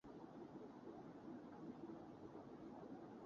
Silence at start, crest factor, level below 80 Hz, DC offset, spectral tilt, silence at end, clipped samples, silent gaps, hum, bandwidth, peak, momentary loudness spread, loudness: 0.05 s; 14 dB; -82 dBFS; under 0.1%; -7 dB/octave; 0 s; under 0.1%; none; none; 7.2 kHz; -42 dBFS; 2 LU; -57 LUFS